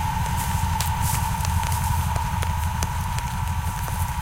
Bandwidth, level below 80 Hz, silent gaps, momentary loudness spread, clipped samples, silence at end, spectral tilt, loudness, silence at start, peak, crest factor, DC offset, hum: 17 kHz; -30 dBFS; none; 3 LU; under 0.1%; 0 s; -4 dB/octave; -25 LUFS; 0 s; -6 dBFS; 18 dB; under 0.1%; none